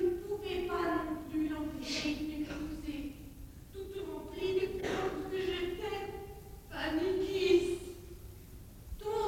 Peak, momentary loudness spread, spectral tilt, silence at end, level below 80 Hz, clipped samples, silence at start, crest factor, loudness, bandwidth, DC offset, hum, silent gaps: -16 dBFS; 18 LU; -5 dB/octave; 0 s; -52 dBFS; under 0.1%; 0 s; 20 dB; -36 LUFS; 17 kHz; under 0.1%; none; none